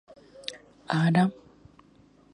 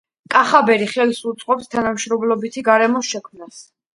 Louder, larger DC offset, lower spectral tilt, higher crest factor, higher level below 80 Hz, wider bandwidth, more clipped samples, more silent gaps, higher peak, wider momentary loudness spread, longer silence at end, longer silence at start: second, -26 LUFS vs -17 LUFS; neither; first, -7 dB/octave vs -3.5 dB/octave; about the same, 20 dB vs 18 dB; second, -66 dBFS vs -60 dBFS; about the same, 10.5 kHz vs 11.5 kHz; neither; neither; second, -10 dBFS vs 0 dBFS; first, 17 LU vs 8 LU; first, 1 s vs 0.3 s; first, 0.5 s vs 0.3 s